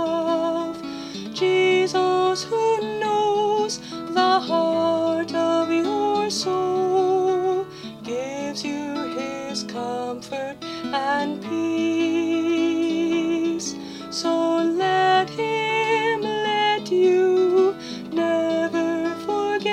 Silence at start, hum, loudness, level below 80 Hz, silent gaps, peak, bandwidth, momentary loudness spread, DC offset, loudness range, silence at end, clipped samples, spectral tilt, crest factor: 0 s; none; -22 LUFS; -64 dBFS; none; -6 dBFS; 12 kHz; 10 LU; under 0.1%; 6 LU; 0 s; under 0.1%; -4 dB/octave; 16 dB